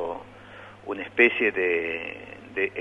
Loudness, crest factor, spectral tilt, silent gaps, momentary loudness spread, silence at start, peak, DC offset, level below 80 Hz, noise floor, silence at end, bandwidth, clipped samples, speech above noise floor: -24 LUFS; 22 dB; -6 dB/octave; none; 24 LU; 0 s; -4 dBFS; under 0.1%; -62 dBFS; -45 dBFS; 0 s; 6 kHz; under 0.1%; 21 dB